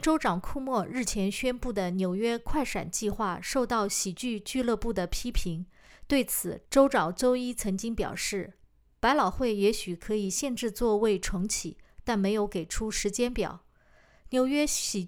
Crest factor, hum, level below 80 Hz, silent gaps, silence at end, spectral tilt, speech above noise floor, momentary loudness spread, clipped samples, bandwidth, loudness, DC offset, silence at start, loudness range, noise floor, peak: 20 dB; none; -42 dBFS; none; 0 s; -4 dB/octave; 32 dB; 7 LU; under 0.1%; over 20 kHz; -29 LUFS; under 0.1%; 0 s; 2 LU; -60 dBFS; -8 dBFS